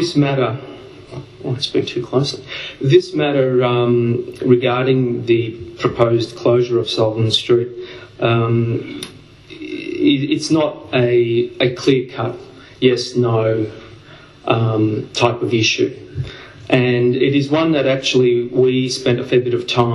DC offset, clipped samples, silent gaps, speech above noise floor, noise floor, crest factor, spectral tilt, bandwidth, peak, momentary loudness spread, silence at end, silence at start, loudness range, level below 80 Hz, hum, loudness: under 0.1%; under 0.1%; none; 25 dB; -41 dBFS; 16 dB; -6 dB/octave; 11.5 kHz; 0 dBFS; 14 LU; 0 s; 0 s; 3 LU; -52 dBFS; none; -17 LUFS